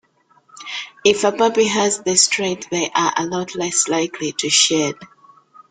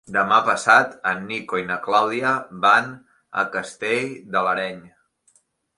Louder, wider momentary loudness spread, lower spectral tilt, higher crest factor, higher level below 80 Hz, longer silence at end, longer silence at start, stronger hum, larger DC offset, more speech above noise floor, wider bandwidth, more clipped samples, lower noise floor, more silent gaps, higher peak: first, -17 LUFS vs -20 LUFS; about the same, 12 LU vs 11 LU; second, -2 dB/octave vs -3.5 dB/octave; about the same, 18 dB vs 20 dB; about the same, -62 dBFS vs -66 dBFS; second, 0.65 s vs 0.9 s; first, 0.55 s vs 0.1 s; neither; neither; about the same, 38 dB vs 41 dB; about the same, 10.5 kHz vs 11.5 kHz; neither; second, -57 dBFS vs -62 dBFS; neither; about the same, 0 dBFS vs -2 dBFS